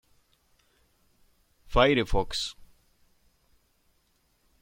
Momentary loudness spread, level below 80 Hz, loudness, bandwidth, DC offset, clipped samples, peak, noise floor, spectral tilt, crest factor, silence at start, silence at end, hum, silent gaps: 10 LU; -40 dBFS; -26 LUFS; 16 kHz; under 0.1%; under 0.1%; -6 dBFS; -70 dBFS; -4.5 dB/octave; 24 dB; 1.7 s; 2.1 s; none; none